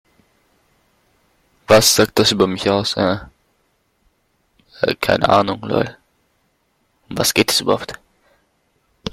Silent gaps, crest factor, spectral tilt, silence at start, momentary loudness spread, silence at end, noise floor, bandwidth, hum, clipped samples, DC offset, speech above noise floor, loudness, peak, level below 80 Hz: none; 20 dB; -3.5 dB/octave; 1.7 s; 14 LU; 0.05 s; -65 dBFS; 16.5 kHz; none; under 0.1%; under 0.1%; 48 dB; -16 LUFS; 0 dBFS; -48 dBFS